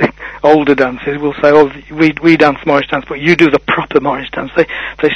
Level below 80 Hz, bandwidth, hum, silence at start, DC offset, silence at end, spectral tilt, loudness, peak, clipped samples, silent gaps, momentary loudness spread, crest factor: -40 dBFS; 7.8 kHz; none; 0 s; under 0.1%; 0 s; -6.5 dB/octave; -12 LUFS; 0 dBFS; 0.7%; none; 8 LU; 12 dB